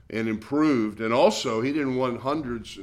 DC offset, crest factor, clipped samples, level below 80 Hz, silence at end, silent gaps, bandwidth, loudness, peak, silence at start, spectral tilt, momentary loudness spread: under 0.1%; 18 dB; under 0.1%; -56 dBFS; 0 s; none; 14 kHz; -25 LUFS; -8 dBFS; 0.1 s; -5.5 dB/octave; 8 LU